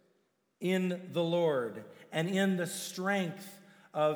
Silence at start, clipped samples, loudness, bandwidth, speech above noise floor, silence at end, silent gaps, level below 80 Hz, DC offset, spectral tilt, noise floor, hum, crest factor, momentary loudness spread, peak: 0.6 s; under 0.1%; -33 LUFS; over 20 kHz; 42 dB; 0 s; none; under -90 dBFS; under 0.1%; -5.5 dB/octave; -75 dBFS; none; 16 dB; 11 LU; -18 dBFS